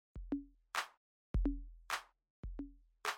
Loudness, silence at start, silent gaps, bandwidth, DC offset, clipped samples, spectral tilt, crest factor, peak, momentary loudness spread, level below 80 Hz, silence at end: -44 LUFS; 0.15 s; 0.97-1.34 s, 2.30-2.43 s; 16.5 kHz; under 0.1%; under 0.1%; -4.5 dB/octave; 20 dB; -24 dBFS; 12 LU; -46 dBFS; 0 s